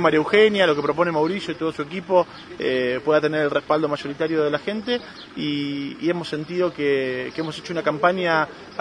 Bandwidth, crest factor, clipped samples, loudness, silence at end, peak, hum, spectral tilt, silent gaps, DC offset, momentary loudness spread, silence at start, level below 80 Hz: 10 kHz; 18 dB; under 0.1%; -22 LUFS; 0 s; -4 dBFS; none; -6 dB/octave; none; under 0.1%; 10 LU; 0 s; -60 dBFS